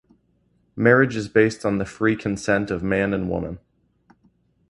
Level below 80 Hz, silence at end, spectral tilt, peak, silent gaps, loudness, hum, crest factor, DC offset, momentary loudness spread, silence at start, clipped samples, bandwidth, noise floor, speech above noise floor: -48 dBFS; 1.15 s; -6.5 dB/octave; -2 dBFS; none; -21 LUFS; none; 22 dB; under 0.1%; 12 LU; 0.75 s; under 0.1%; 11.5 kHz; -64 dBFS; 44 dB